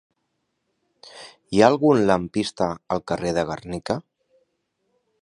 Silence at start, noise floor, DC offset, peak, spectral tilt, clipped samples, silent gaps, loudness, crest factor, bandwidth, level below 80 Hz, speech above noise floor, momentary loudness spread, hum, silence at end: 1.15 s; -75 dBFS; under 0.1%; -2 dBFS; -6 dB/octave; under 0.1%; none; -22 LUFS; 22 dB; 11 kHz; -54 dBFS; 54 dB; 14 LU; none; 1.2 s